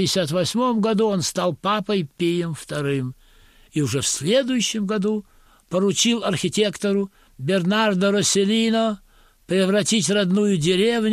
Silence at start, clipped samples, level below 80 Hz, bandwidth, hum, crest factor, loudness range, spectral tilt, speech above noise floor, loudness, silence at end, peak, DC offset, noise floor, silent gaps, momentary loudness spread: 0 s; under 0.1%; -56 dBFS; 15 kHz; none; 14 dB; 4 LU; -4 dB/octave; 31 dB; -21 LUFS; 0 s; -6 dBFS; under 0.1%; -52 dBFS; none; 7 LU